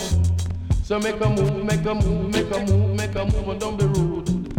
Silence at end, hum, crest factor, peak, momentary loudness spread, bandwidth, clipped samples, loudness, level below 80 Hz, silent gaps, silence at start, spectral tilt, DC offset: 0 s; none; 14 dB; -6 dBFS; 5 LU; 16 kHz; under 0.1%; -22 LUFS; -30 dBFS; none; 0 s; -6.5 dB/octave; under 0.1%